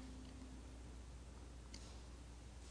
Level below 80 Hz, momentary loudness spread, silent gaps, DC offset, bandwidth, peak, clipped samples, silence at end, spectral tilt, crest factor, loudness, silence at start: -56 dBFS; 2 LU; none; under 0.1%; 10.5 kHz; -38 dBFS; under 0.1%; 0 s; -5 dB/octave; 16 dB; -57 LUFS; 0 s